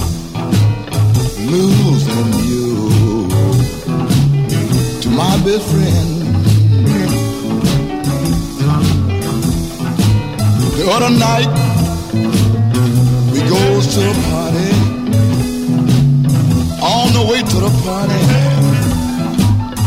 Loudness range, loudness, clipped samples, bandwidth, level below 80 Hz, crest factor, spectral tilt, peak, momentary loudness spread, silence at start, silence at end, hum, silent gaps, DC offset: 2 LU; -13 LUFS; under 0.1%; 16 kHz; -30 dBFS; 12 dB; -6 dB/octave; 0 dBFS; 5 LU; 0 s; 0 s; none; none; 0.5%